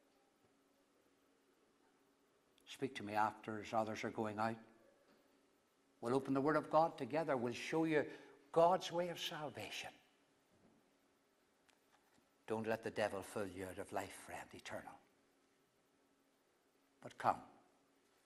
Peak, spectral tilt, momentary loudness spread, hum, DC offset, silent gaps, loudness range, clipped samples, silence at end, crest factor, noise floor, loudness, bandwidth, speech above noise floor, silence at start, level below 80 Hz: -20 dBFS; -5 dB/octave; 16 LU; none; under 0.1%; none; 13 LU; under 0.1%; 0.8 s; 24 dB; -78 dBFS; -41 LUFS; 15.5 kHz; 37 dB; 2.65 s; -82 dBFS